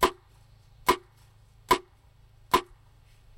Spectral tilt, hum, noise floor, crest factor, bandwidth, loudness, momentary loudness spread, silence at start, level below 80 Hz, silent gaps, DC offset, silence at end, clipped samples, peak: -3 dB/octave; none; -58 dBFS; 22 dB; 16 kHz; -28 LUFS; 2 LU; 0 s; -52 dBFS; none; under 0.1%; 0.75 s; under 0.1%; -8 dBFS